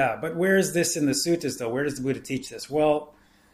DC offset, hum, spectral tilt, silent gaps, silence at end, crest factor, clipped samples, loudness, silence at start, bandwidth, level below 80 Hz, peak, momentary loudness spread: under 0.1%; none; -4 dB/octave; none; 0.45 s; 14 dB; under 0.1%; -25 LUFS; 0 s; 15.5 kHz; -58 dBFS; -10 dBFS; 8 LU